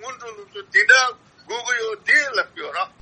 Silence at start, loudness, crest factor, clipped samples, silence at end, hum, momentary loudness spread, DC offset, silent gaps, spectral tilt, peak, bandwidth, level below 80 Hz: 0 s; -18 LUFS; 20 dB; under 0.1%; 0.15 s; none; 22 LU; under 0.1%; none; 0.5 dB/octave; -2 dBFS; 8.8 kHz; -70 dBFS